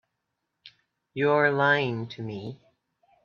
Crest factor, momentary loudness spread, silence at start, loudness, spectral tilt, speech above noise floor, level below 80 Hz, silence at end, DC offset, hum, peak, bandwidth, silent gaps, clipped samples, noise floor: 20 dB; 18 LU; 0.65 s; -25 LUFS; -7 dB/octave; 56 dB; -70 dBFS; 0.7 s; under 0.1%; none; -8 dBFS; 6.8 kHz; none; under 0.1%; -81 dBFS